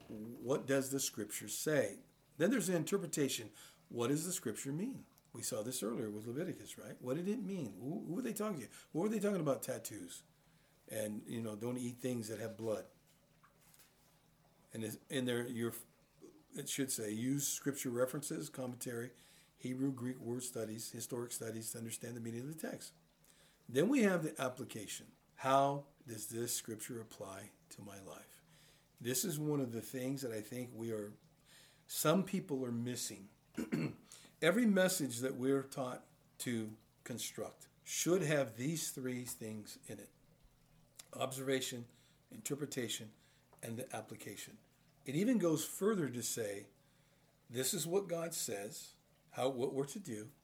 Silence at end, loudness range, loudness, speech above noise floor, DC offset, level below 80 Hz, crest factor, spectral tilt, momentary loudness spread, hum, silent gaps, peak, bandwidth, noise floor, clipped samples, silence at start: 0.1 s; 7 LU; -40 LUFS; 31 dB; under 0.1%; -80 dBFS; 24 dB; -4.5 dB/octave; 17 LU; none; none; -16 dBFS; over 20 kHz; -71 dBFS; under 0.1%; 0 s